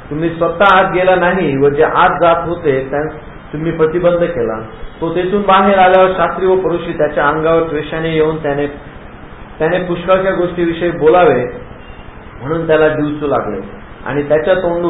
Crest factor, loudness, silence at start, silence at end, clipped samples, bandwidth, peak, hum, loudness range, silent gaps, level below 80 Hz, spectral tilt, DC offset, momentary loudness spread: 14 dB; -13 LUFS; 0 s; 0 s; under 0.1%; 4 kHz; 0 dBFS; none; 4 LU; none; -36 dBFS; -9 dB/octave; under 0.1%; 14 LU